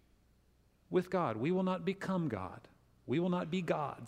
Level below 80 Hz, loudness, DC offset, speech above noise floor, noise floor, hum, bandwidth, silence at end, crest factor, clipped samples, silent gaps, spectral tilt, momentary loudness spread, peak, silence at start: -70 dBFS; -36 LUFS; under 0.1%; 35 dB; -69 dBFS; none; 10.5 kHz; 0 s; 18 dB; under 0.1%; none; -7.5 dB/octave; 10 LU; -20 dBFS; 0.9 s